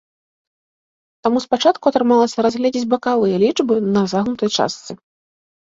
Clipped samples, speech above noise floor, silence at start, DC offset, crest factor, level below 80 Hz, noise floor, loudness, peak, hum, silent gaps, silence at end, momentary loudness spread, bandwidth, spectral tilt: under 0.1%; over 73 dB; 1.25 s; under 0.1%; 16 dB; -60 dBFS; under -90 dBFS; -17 LUFS; -2 dBFS; none; none; 0.75 s; 8 LU; 7.8 kHz; -5 dB/octave